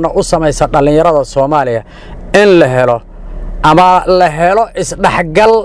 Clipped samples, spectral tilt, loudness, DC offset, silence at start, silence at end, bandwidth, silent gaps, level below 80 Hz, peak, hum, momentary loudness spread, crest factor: 3%; -5.5 dB/octave; -9 LUFS; under 0.1%; 0 s; 0 s; 11 kHz; none; -26 dBFS; 0 dBFS; none; 9 LU; 10 dB